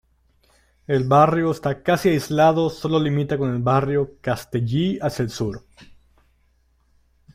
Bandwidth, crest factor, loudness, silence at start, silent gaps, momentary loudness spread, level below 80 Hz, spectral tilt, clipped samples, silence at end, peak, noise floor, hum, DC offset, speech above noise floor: 16 kHz; 18 dB; -21 LUFS; 0.9 s; none; 9 LU; -50 dBFS; -7 dB/octave; under 0.1%; 1.5 s; -4 dBFS; -62 dBFS; none; under 0.1%; 42 dB